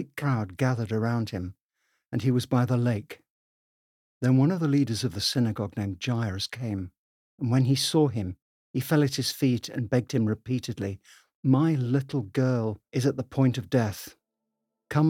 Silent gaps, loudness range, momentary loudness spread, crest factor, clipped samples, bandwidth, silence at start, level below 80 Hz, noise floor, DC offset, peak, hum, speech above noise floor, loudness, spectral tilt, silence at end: 1.61-1.69 s, 3.30-4.21 s, 6.98-7.38 s, 8.42-8.74 s, 11.35-11.43 s; 2 LU; 12 LU; 18 dB; under 0.1%; 16.5 kHz; 0 s; -66 dBFS; -84 dBFS; under 0.1%; -8 dBFS; none; 58 dB; -27 LUFS; -6.5 dB/octave; 0 s